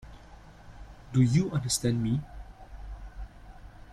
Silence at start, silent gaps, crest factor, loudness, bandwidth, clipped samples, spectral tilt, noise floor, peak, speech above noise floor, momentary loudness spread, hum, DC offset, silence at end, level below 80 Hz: 0.05 s; none; 18 dB; -27 LUFS; 14.5 kHz; under 0.1%; -5.5 dB/octave; -50 dBFS; -12 dBFS; 24 dB; 26 LU; none; under 0.1%; 0 s; -46 dBFS